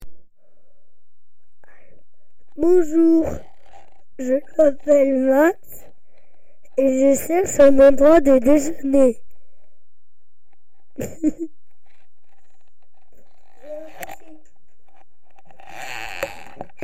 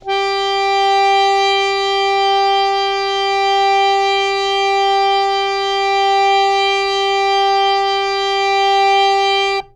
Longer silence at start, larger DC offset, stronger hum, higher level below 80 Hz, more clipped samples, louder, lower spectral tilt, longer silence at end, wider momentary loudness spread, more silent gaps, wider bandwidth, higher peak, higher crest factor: about the same, 0 s vs 0.05 s; first, 3% vs under 0.1%; neither; about the same, -44 dBFS vs -48 dBFS; neither; second, -17 LUFS vs -14 LUFS; first, -5 dB/octave vs -1 dB/octave; about the same, 0.2 s vs 0.1 s; first, 24 LU vs 4 LU; neither; first, 16 kHz vs 10.5 kHz; about the same, -4 dBFS vs -4 dBFS; about the same, 16 dB vs 12 dB